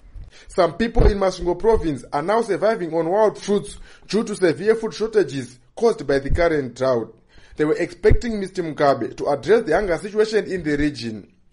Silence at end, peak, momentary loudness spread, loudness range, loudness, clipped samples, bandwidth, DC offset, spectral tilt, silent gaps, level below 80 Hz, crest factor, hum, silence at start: 0.3 s; -4 dBFS; 7 LU; 1 LU; -21 LUFS; under 0.1%; 11 kHz; under 0.1%; -6 dB/octave; none; -30 dBFS; 16 dB; none; 0.15 s